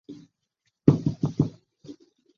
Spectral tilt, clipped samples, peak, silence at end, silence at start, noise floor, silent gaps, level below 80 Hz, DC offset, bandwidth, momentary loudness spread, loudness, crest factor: -10 dB/octave; under 0.1%; 0 dBFS; 0.45 s; 0.1 s; -77 dBFS; none; -54 dBFS; under 0.1%; 7 kHz; 7 LU; -25 LUFS; 26 dB